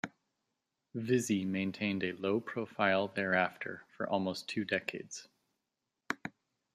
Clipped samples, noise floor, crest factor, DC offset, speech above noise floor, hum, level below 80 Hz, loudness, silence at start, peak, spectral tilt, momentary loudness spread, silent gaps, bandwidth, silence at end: under 0.1%; -87 dBFS; 22 dB; under 0.1%; 53 dB; none; -78 dBFS; -35 LUFS; 0.05 s; -14 dBFS; -5 dB/octave; 13 LU; none; 14 kHz; 0.45 s